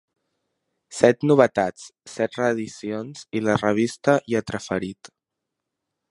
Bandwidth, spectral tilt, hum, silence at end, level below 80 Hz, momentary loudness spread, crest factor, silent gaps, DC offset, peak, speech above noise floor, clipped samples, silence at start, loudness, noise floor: 11.5 kHz; -6 dB/octave; none; 1.2 s; -60 dBFS; 14 LU; 22 dB; none; under 0.1%; 0 dBFS; 61 dB; under 0.1%; 0.9 s; -22 LUFS; -83 dBFS